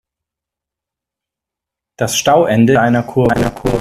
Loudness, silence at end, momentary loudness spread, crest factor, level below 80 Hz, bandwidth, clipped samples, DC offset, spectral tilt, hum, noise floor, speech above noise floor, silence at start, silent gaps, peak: -13 LUFS; 0 s; 6 LU; 16 dB; -38 dBFS; 14.5 kHz; under 0.1%; under 0.1%; -5 dB/octave; none; -84 dBFS; 72 dB; 2 s; none; 0 dBFS